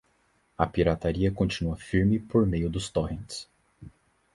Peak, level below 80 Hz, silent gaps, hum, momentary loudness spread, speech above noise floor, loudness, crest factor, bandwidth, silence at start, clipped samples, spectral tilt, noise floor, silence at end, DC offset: -6 dBFS; -42 dBFS; none; none; 9 LU; 42 dB; -27 LUFS; 22 dB; 11.5 kHz; 0.6 s; under 0.1%; -6.5 dB/octave; -68 dBFS; 0.45 s; under 0.1%